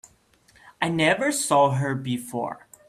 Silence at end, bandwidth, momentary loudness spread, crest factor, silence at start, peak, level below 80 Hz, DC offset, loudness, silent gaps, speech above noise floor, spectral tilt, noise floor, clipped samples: 0.3 s; 15.5 kHz; 11 LU; 18 dB; 0.65 s; -6 dBFS; -62 dBFS; under 0.1%; -23 LUFS; none; 36 dB; -4.5 dB/octave; -59 dBFS; under 0.1%